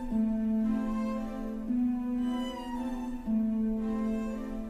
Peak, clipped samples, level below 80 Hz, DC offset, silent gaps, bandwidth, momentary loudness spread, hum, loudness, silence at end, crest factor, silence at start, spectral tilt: -20 dBFS; under 0.1%; -46 dBFS; under 0.1%; none; 9.6 kHz; 7 LU; none; -32 LUFS; 0 s; 10 dB; 0 s; -7.5 dB/octave